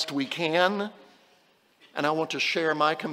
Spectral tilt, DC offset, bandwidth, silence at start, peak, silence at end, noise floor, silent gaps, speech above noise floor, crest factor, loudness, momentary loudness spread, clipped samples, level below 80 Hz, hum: -4 dB/octave; under 0.1%; 16 kHz; 0 s; -8 dBFS; 0 s; -63 dBFS; none; 37 dB; 20 dB; -26 LUFS; 9 LU; under 0.1%; -82 dBFS; none